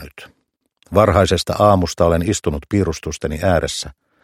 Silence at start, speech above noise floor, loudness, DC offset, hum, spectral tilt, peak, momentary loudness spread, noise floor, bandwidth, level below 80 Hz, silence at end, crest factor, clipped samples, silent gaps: 0 s; 52 dB; -17 LUFS; under 0.1%; none; -5.5 dB/octave; 0 dBFS; 11 LU; -68 dBFS; 15.5 kHz; -34 dBFS; 0.3 s; 18 dB; under 0.1%; none